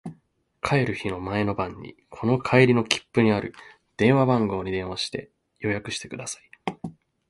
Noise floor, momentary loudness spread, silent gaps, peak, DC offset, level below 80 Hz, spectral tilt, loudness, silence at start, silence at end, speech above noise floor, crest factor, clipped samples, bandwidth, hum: -63 dBFS; 18 LU; none; -2 dBFS; under 0.1%; -52 dBFS; -5.5 dB/octave; -24 LUFS; 0.05 s; 0.4 s; 40 dB; 24 dB; under 0.1%; 11.5 kHz; none